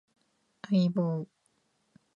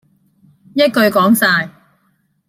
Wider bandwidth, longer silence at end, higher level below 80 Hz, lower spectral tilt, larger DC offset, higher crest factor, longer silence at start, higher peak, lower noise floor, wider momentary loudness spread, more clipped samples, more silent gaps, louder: second, 7.2 kHz vs 16.5 kHz; about the same, 0.9 s vs 0.8 s; second, -78 dBFS vs -62 dBFS; first, -9 dB/octave vs -4.5 dB/octave; neither; about the same, 16 dB vs 16 dB; about the same, 0.7 s vs 0.75 s; second, -16 dBFS vs 0 dBFS; first, -73 dBFS vs -61 dBFS; first, 20 LU vs 11 LU; neither; neither; second, -29 LUFS vs -13 LUFS